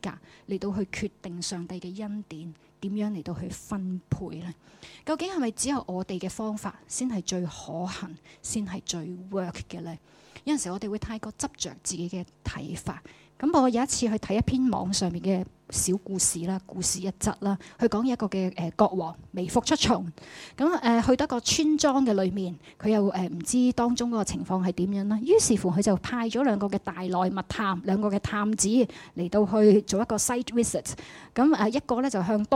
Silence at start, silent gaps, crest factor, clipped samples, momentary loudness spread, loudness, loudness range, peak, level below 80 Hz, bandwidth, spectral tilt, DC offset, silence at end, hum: 0.05 s; none; 20 dB; under 0.1%; 14 LU; -27 LUFS; 9 LU; -6 dBFS; -52 dBFS; 15.5 kHz; -4.5 dB/octave; under 0.1%; 0 s; none